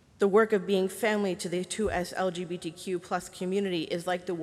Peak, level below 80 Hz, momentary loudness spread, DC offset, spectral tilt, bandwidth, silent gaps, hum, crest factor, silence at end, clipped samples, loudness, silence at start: -12 dBFS; -56 dBFS; 10 LU; under 0.1%; -5 dB/octave; 14.5 kHz; none; none; 18 dB; 0 s; under 0.1%; -29 LUFS; 0.2 s